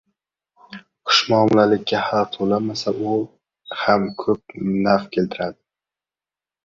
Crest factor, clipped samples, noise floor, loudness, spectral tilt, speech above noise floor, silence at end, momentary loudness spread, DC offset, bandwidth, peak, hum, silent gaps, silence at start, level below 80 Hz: 20 dB; under 0.1%; under -90 dBFS; -20 LUFS; -5 dB/octave; over 71 dB; 1.15 s; 16 LU; under 0.1%; 7.6 kHz; -2 dBFS; none; none; 0.7 s; -58 dBFS